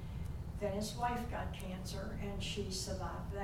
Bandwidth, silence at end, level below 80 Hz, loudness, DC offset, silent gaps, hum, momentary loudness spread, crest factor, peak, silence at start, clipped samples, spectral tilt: 17 kHz; 0 s; -48 dBFS; -41 LUFS; under 0.1%; none; none; 6 LU; 16 dB; -24 dBFS; 0 s; under 0.1%; -5 dB/octave